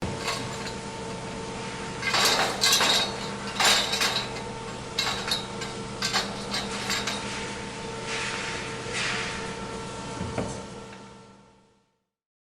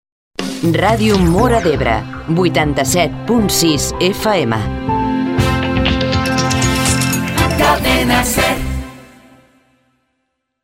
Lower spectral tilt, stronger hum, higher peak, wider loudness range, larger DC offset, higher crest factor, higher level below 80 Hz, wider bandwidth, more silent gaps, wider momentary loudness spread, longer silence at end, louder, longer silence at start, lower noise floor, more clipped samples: second, -2 dB/octave vs -4.5 dB/octave; neither; second, -8 dBFS vs 0 dBFS; first, 10 LU vs 2 LU; neither; first, 22 dB vs 16 dB; second, -52 dBFS vs -28 dBFS; first, 19 kHz vs 16.5 kHz; neither; first, 14 LU vs 7 LU; second, 1 s vs 1.6 s; second, -27 LUFS vs -14 LUFS; second, 0 s vs 0.4 s; about the same, -72 dBFS vs -70 dBFS; neither